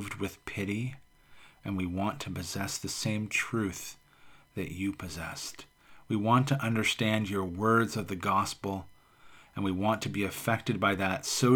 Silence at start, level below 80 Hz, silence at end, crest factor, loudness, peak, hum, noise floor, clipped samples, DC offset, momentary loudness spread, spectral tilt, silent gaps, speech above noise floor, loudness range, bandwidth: 0 s; -60 dBFS; 0 s; 20 dB; -31 LUFS; -12 dBFS; none; -57 dBFS; under 0.1%; under 0.1%; 13 LU; -5 dB/octave; none; 27 dB; 6 LU; over 20 kHz